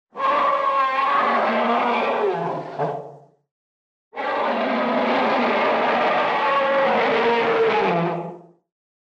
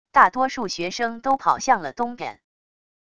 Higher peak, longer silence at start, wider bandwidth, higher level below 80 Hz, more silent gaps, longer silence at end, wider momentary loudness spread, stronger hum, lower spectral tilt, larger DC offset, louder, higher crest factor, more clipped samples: second, -10 dBFS vs 0 dBFS; about the same, 0.15 s vs 0.15 s; second, 8.4 kHz vs 10 kHz; second, -70 dBFS vs -58 dBFS; first, 3.51-4.11 s vs none; about the same, 0.75 s vs 0.8 s; second, 8 LU vs 11 LU; neither; first, -6 dB/octave vs -3 dB/octave; second, under 0.1% vs 0.4%; about the same, -20 LUFS vs -22 LUFS; second, 12 dB vs 22 dB; neither